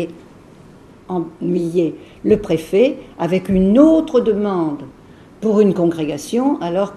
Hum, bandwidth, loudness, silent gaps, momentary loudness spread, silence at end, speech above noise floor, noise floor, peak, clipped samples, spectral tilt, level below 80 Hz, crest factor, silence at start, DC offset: none; 13 kHz; -17 LUFS; none; 13 LU; 0 s; 27 dB; -43 dBFS; 0 dBFS; under 0.1%; -7.5 dB/octave; -44 dBFS; 18 dB; 0 s; under 0.1%